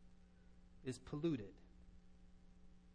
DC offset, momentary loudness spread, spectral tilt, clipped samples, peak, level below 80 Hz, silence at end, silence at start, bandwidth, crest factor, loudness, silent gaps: under 0.1%; 26 LU; -7 dB/octave; under 0.1%; -30 dBFS; -66 dBFS; 0 s; 0 s; 9.4 kHz; 20 dB; -46 LUFS; none